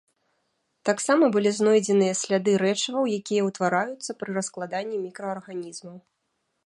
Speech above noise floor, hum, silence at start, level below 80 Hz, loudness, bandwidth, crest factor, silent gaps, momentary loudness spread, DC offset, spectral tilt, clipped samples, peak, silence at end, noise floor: 52 dB; none; 0.85 s; -74 dBFS; -24 LUFS; 11.5 kHz; 20 dB; none; 13 LU; under 0.1%; -4.5 dB/octave; under 0.1%; -6 dBFS; 0.65 s; -76 dBFS